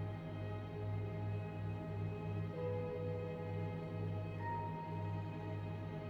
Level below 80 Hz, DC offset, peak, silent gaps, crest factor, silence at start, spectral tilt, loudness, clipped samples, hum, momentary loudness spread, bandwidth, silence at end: -62 dBFS; under 0.1%; -30 dBFS; none; 12 dB; 0 s; -9 dB/octave; -43 LUFS; under 0.1%; none; 3 LU; 5.4 kHz; 0 s